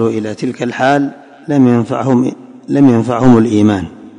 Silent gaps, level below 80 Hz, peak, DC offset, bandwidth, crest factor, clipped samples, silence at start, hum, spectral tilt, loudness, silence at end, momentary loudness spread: none; -42 dBFS; 0 dBFS; under 0.1%; 9.8 kHz; 12 dB; under 0.1%; 0 s; none; -7.5 dB/octave; -12 LUFS; 0.1 s; 11 LU